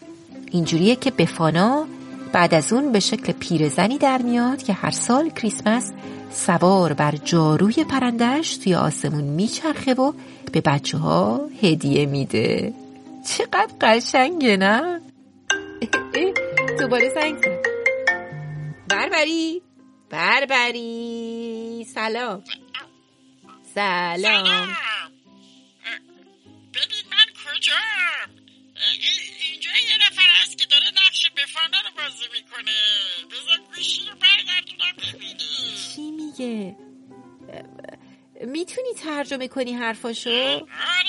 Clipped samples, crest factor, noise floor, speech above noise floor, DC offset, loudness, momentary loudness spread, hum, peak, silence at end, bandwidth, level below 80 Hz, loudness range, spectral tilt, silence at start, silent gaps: under 0.1%; 20 dB; -56 dBFS; 35 dB; under 0.1%; -20 LUFS; 15 LU; none; -2 dBFS; 0 s; 11.5 kHz; -62 dBFS; 10 LU; -4 dB/octave; 0 s; none